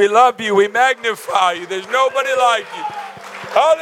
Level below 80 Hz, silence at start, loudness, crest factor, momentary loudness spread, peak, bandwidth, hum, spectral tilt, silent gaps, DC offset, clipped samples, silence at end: -76 dBFS; 0 s; -16 LUFS; 14 dB; 13 LU; -2 dBFS; 16 kHz; none; -2.5 dB/octave; none; under 0.1%; under 0.1%; 0 s